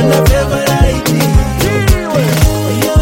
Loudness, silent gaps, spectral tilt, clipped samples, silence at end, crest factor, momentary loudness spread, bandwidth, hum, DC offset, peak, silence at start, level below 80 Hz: -12 LUFS; none; -5.5 dB/octave; under 0.1%; 0 s; 10 dB; 2 LU; 17 kHz; none; under 0.1%; 0 dBFS; 0 s; -16 dBFS